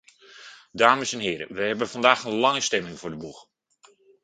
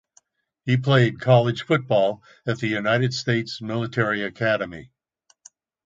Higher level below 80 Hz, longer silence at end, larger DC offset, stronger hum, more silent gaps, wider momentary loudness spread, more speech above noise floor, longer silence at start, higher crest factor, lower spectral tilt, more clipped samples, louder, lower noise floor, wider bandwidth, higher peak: about the same, -64 dBFS vs -60 dBFS; second, 0.8 s vs 1 s; neither; neither; neither; first, 21 LU vs 11 LU; second, 35 dB vs 43 dB; second, 0.35 s vs 0.65 s; first, 26 dB vs 20 dB; second, -2.5 dB/octave vs -6.5 dB/octave; neither; about the same, -23 LUFS vs -22 LUFS; second, -59 dBFS vs -64 dBFS; first, 9.6 kHz vs 7.8 kHz; about the same, 0 dBFS vs -2 dBFS